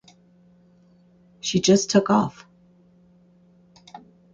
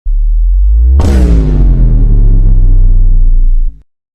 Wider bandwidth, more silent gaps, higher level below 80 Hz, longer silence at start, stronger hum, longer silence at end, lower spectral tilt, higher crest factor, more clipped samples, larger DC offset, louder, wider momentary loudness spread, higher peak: first, 8.8 kHz vs 3 kHz; neither; second, -62 dBFS vs -6 dBFS; first, 1.45 s vs 0.05 s; neither; about the same, 0.35 s vs 0.45 s; second, -4.5 dB/octave vs -8.5 dB/octave; first, 20 dB vs 6 dB; second, under 0.1% vs 0.2%; neither; second, -21 LUFS vs -11 LUFS; first, 12 LU vs 6 LU; second, -6 dBFS vs 0 dBFS